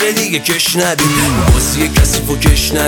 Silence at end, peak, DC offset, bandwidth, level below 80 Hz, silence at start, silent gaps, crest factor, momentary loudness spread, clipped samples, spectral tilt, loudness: 0 s; 0 dBFS; under 0.1%; over 20 kHz; -18 dBFS; 0 s; none; 12 dB; 2 LU; under 0.1%; -3.5 dB/octave; -12 LUFS